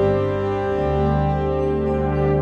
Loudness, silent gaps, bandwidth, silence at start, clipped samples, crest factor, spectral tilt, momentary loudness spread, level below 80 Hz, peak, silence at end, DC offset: -21 LUFS; none; 6.6 kHz; 0 s; under 0.1%; 12 dB; -9.5 dB/octave; 2 LU; -30 dBFS; -8 dBFS; 0 s; under 0.1%